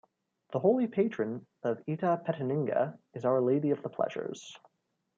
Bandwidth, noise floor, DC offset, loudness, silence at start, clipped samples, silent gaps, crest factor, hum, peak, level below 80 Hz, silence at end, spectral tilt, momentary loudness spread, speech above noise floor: 7.6 kHz; -60 dBFS; under 0.1%; -31 LUFS; 0.5 s; under 0.1%; none; 18 dB; none; -12 dBFS; -80 dBFS; 0.6 s; -8 dB/octave; 10 LU; 30 dB